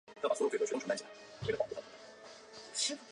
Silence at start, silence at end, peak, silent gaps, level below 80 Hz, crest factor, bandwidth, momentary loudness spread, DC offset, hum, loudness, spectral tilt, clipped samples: 0.1 s; 0 s; -20 dBFS; none; -70 dBFS; 18 dB; 11 kHz; 19 LU; under 0.1%; none; -37 LUFS; -2.5 dB/octave; under 0.1%